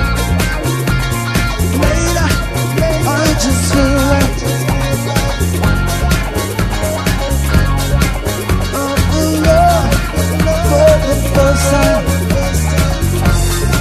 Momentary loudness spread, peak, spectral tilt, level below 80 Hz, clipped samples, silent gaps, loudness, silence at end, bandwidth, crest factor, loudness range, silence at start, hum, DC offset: 5 LU; 0 dBFS; -5 dB/octave; -18 dBFS; under 0.1%; none; -14 LUFS; 0 s; 14.5 kHz; 12 dB; 3 LU; 0 s; none; under 0.1%